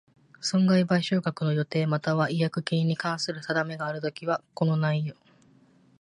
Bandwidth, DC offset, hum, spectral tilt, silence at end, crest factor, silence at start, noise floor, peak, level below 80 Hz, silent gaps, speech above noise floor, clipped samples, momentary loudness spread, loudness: 11 kHz; under 0.1%; none; -6 dB/octave; 0.9 s; 16 dB; 0.4 s; -59 dBFS; -10 dBFS; -70 dBFS; none; 33 dB; under 0.1%; 8 LU; -27 LUFS